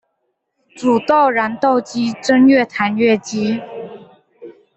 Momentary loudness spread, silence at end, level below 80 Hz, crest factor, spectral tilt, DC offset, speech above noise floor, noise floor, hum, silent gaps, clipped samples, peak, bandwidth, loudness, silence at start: 12 LU; 0.25 s; -60 dBFS; 14 dB; -5 dB/octave; under 0.1%; 56 dB; -71 dBFS; none; none; under 0.1%; -2 dBFS; 8.2 kHz; -15 LUFS; 0.75 s